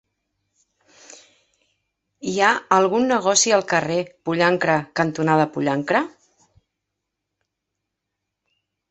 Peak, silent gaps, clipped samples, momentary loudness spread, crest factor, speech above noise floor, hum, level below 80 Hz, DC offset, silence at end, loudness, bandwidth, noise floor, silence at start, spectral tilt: -2 dBFS; none; under 0.1%; 9 LU; 20 dB; 62 dB; none; -66 dBFS; under 0.1%; 2.8 s; -19 LUFS; 8.6 kHz; -81 dBFS; 2.2 s; -3.5 dB/octave